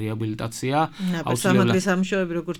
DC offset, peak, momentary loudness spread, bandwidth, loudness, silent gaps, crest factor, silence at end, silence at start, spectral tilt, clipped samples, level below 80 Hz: under 0.1%; -4 dBFS; 9 LU; 17.5 kHz; -23 LUFS; none; 18 dB; 0 s; 0 s; -5.5 dB/octave; under 0.1%; -54 dBFS